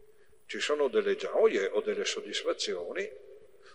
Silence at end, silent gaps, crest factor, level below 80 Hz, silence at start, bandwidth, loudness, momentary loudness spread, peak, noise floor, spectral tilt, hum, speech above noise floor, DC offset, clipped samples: 0.05 s; none; 18 dB; -74 dBFS; 0.5 s; 10.5 kHz; -30 LUFS; 11 LU; -12 dBFS; -60 dBFS; -2 dB/octave; none; 30 dB; 0.2%; under 0.1%